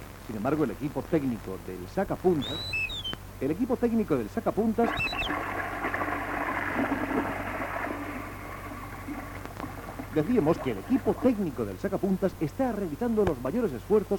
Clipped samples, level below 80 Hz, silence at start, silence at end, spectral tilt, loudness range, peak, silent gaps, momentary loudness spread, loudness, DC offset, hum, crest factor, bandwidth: under 0.1%; -48 dBFS; 0 s; 0 s; -6.5 dB/octave; 4 LU; -10 dBFS; none; 12 LU; -30 LUFS; under 0.1%; none; 18 dB; 19 kHz